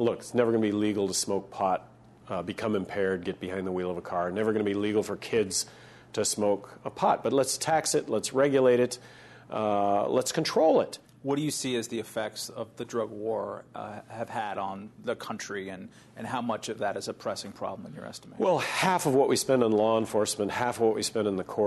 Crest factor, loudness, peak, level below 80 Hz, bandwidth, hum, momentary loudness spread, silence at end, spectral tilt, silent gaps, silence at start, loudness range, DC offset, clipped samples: 18 dB; -28 LUFS; -10 dBFS; -68 dBFS; 12.5 kHz; none; 13 LU; 0 s; -4 dB/octave; none; 0 s; 9 LU; under 0.1%; under 0.1%